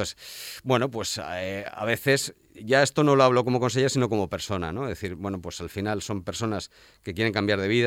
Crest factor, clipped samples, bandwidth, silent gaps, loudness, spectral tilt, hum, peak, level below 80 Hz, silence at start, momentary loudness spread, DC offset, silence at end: 20 dB; under 0.1%; 18 kHz; none; -26 LUFS; -5 dB/octave; none; -6 dBFS; -58 dBFS; 0 s; 14 LU; under 0.1%; 0 s